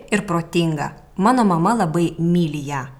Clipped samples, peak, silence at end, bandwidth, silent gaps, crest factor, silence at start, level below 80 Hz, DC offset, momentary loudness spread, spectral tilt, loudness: under 0.1%; -4 dBFS; 0.05 s; 13 kHz; none; 16 dB; 0 s; -48 dBFS; under 0.1%; 8 LU; -6.5 dB/octave; -19 LUFS